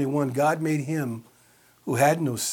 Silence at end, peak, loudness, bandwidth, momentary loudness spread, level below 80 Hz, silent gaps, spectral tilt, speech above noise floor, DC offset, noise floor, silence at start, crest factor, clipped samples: 0 s; -8 dBFS; -25 LUFS; 19 kHz; 13 LU; -70 dBFS; none; -5.5 dB/octave; 34 dB; under 0.1%; -58 dBFS; 0 s; 18 dB; under 0.1%